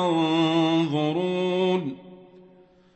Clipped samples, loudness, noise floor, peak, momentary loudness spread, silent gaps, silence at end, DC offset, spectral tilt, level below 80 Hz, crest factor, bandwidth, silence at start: under 0.1%; -23 LUFS; -54 dBFS; -10 dBFS; 8 LU; none; 0.75 s; under 0.1%; -6.5 dB/octave; -70 dBFS; 14 dB; 8.4 kHz; 0 s